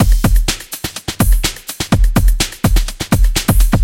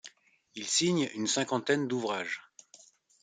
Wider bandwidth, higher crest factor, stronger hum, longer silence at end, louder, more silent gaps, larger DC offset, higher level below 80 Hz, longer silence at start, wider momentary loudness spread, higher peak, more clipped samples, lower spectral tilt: first, 17 kHz vs 9.6 kHz; second, 12 dB vs 20 dB; neither; second, 0 s vs 0.8 s; first, -16 LUFS vs -30 LUFS; neither; neither; first, -14 dBFS vs -78 dBFS; about the same, 0 s vs 0.05 s; second, 9 LU vs 13 LU; first, 0 dBFS vs -14 dBFS; neither; first, -4.5 dB/octave vs -3 dB/octave